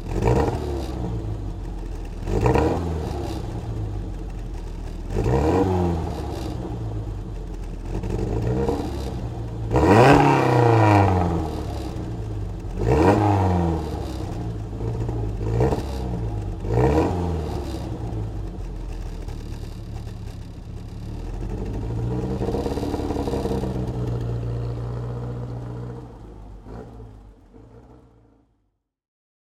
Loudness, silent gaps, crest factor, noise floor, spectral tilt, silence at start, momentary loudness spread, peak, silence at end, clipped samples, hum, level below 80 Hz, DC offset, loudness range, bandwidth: -24 LUFS; none; 22 dB; -72 dBFS; -7.5 dB/octave; 0 s; 17 LU; -2 dBFS; 1.65 s; under 0.1%; none; -32 dBFS; under 0.1%; 15 LU; 14 kHz